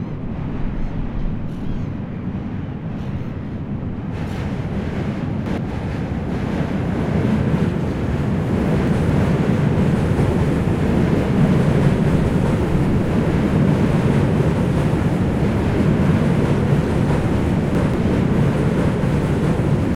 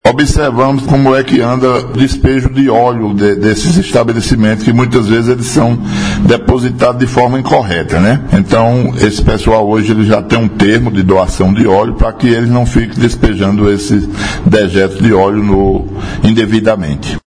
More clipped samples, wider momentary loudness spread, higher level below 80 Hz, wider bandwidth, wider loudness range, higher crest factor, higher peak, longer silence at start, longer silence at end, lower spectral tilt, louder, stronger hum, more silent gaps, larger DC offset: second, under 0.1% vs 0.7%; first, 10 LU vs 4 LU; second, -30 dBFS vs -22 dBFS; about the same, 11.5 kHz vs 10.5 kHz; first, 9 LU vs 1 LU; about the same, 14 dB vs 10 dB; second, -4 dBFS vs 0 dBFS; about the same, 0 s vs 0.05 s; about the same, 0 s vs 0.1 s; first, -8.5 dB/octave vs -6.5 dB/octave; second, -19 LUFS vs -10 LUFS; neither; neither; second, under 0.1% vs 0.9%